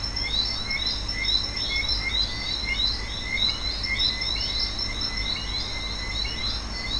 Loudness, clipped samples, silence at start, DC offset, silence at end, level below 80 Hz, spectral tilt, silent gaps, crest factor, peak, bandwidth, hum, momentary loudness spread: -25 LUFS; under 0.1%; 0 s; under 0.1%; 0 s; -34 dBFS; -2.5 dB/octave; none; 16 dB; -12 dBFS; 10.5 kHz; none; 5 LU